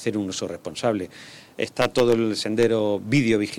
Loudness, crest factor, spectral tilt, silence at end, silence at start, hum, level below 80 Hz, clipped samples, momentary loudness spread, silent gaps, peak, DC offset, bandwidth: -23 LUFS; 14 dB; -5.5 dB/octave; 0 s; 0 s; none; -58 dBFS; under 0.1%; 11 LU; none; -8 dBFS; under 0.1%; 17 kHz